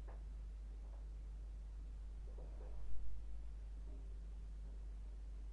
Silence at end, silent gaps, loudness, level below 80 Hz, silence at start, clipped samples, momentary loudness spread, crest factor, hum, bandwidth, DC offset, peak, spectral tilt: 0 s; none; -54 LUFS; -50 dBFS; 0 s; under 0.1%; 0 LU; 16 dB; none; 6.8 kHz; under 0.1%; -28 dBFS; -7 dB/octave